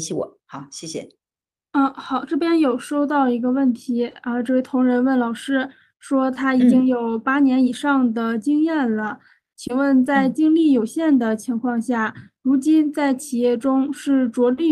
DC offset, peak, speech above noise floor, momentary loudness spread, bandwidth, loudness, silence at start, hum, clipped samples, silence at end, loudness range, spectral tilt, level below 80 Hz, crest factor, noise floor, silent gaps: under 0.1%; -6 dBFS; over 71 dB; 10 LU; 12.5 kHz; -19 LUFS; 0 s; none; under 0.1%; 0 s; 3 LU; -5 dB/octave; -66 dBFS; 14 dB; under -90 dBFS; none